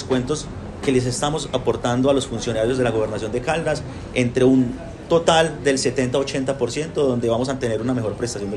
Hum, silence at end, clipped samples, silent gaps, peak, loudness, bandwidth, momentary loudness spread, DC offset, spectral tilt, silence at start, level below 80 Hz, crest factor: none; 0 s; under 0.1%; none; -2 dBFS; -21 LUFS; 12 kHz; 9 LU; under 0.1%; -5 dB/octave; 0 s; -42 dBFS; 20 dB